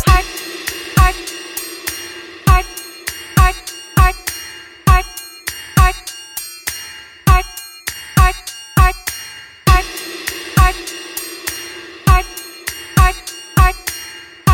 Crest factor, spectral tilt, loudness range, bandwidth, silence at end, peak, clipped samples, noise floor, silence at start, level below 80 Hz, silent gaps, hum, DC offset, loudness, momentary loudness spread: 16 dB; -4 dB/octave; 2 LU; 17 kHz; 0 s; 0 dBFS; under 0.1%; -34 dBFS; 0 s; -20 dBFS; none; none; under 0.1%; -17 LUFS; 13 LU